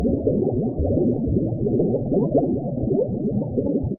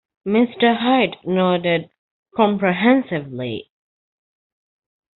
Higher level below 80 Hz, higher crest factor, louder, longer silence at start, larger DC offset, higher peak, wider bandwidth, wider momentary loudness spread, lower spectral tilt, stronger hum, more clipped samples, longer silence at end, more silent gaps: first, -36 dBFS vs -60 dBFS; about the same, 14 dB vs 18 dB; second, -22 LUFS vs -19 LUFS; second, 0 s vs 0.25 s; neither; second, -8 dBFS vs -2 dBFS; second, 1.4 kHz vs 4.2 kHz; second, 3 LU vs 12 LU; first, -15.5 dB/octave vs -4 dB/octave; neither; neither; second, 0 s vs 1.55 s; second, none vs 1.98-2.23 s